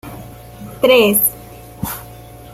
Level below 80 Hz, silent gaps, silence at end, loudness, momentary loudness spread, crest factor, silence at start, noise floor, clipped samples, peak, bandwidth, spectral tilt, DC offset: -44 dBFS; none; 0.1 s; -14 LUFS; 25 LU; 16 dB; 0.05 s; -36 dBFS; under 0.1%; -2 dBFS; 16 kHz; -3 dB/octave; under 0.1%